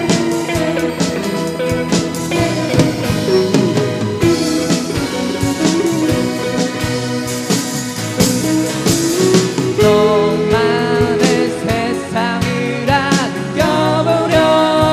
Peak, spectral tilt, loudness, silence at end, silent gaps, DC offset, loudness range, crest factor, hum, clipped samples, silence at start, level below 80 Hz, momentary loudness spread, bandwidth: 0 dBFS; -5 dB/octave; -15 LUFS; 0 s; none; under 0.1%; 3 LU; 14 dB; none; under 0.1%; 0 s; -38 dBFS; 6 LU; 15.5 kHz